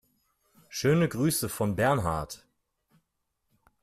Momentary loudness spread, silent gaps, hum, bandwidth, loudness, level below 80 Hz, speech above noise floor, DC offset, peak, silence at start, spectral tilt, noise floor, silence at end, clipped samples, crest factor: 14 LU; none; none; 15.5 kHz; -27 LUFS; -54 dBFS; 53 dB; under 0.1%; -12 dBFS; 0.7 s; -5.5 dB/octave; -79 dBFS; 1.45 s; under 0.1%; 20 dB